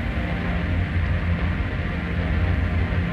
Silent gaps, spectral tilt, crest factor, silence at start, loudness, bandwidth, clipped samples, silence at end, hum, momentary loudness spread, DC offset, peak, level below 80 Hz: none; -8.5 dB/octave; 12 dB; 0 s; -24 LUFS; 5.6 kHz; under 0.1%; 0 s; none; 3 LU; under 0.1%; -12 dBFS; -28 dBFS